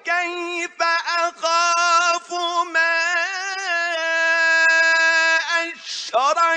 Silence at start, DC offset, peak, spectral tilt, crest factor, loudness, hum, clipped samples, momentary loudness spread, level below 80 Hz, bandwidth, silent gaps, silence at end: 0.05 s; under 0.1%; -6 dBFS; 2 dB/octave; 14 dB; -18 LUFS; none; under 0.1%; 9 LU; -84 dBFS; 9.6 kHz; none; 0 s